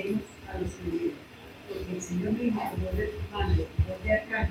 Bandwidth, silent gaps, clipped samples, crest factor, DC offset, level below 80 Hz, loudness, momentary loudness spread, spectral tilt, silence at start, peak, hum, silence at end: 16 kHz; none; under 0.1%; 18 dB; under 0.1%; -40 dBFS; -31 LUFS; 12 LU; -6.5 dB/octave; 0 s; -12 dBFS; none; 0 s